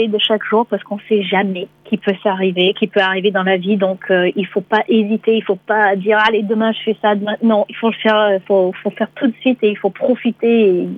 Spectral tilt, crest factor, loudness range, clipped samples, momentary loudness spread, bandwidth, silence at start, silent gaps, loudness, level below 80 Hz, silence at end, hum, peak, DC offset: -7.5 dB/octave; 14 dB; 1 LU; under 0.1%; 6 LU; 5.6 kHz; 0 s; none; -16 LUFS; -66 dBFS; 0 s; none; -2 dBFS; under 0.1%